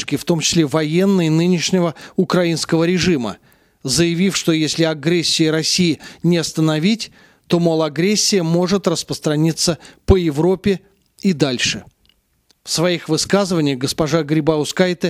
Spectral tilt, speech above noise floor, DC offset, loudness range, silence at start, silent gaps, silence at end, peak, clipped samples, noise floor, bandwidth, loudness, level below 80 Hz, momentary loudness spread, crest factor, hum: -4.5 dB/octave; 44 dB; under 0.1%; 3 LU; 0 s; none; 0 s; 0 dBFS; under 0.1%; -60 dBFS; 15.5 kHz; -17 LUFS; -40 dBFS; 6 LU; 18 dB; none